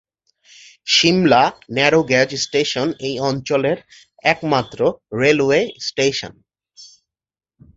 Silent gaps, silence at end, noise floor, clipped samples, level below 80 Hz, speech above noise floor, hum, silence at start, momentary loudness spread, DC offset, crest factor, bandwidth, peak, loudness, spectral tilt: none; 0.9 s; under -90 dBFS; under 0.1%; -54 dBFS; over 73 dB; none; 0.85 s; 9 LU; under 0.1%; 18 dB; 7.8 kHz; -2 dBFS; -17 LUFS; -4 dB/octave